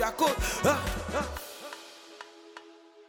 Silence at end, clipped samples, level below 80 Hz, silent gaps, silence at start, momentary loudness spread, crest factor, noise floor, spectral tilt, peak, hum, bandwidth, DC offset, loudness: 0.05 s; under 0.1%; -42 dBFS; none; 0 s; 21 LU; 20 dB; -53 dBFS; -3.5 dB/octave; -12 dBFS; none; over 20 kHz; under 0.1%; -30 LUFS